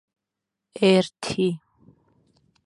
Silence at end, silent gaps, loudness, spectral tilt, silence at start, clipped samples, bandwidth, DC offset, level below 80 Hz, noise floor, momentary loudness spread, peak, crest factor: 1.1 s; none; -22 LUFS; -5.5 dB/octave; 0.75 s; under 0.1%; 11.5 kHz; under 0.1%; -64 dBFS; -85 dBFS; 17 LU; -4 dBFS; 22 dB